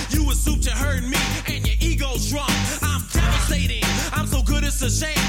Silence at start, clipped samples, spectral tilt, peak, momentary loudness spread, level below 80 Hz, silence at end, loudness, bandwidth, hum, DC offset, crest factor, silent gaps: 0 s; under 0.1%; -3.5 dB/octave; -6 dBFS; 3 LU; -24 dBFS; 0 s; -22 LUFS; 17 kHz; none; under 0.1%; 14 dB; none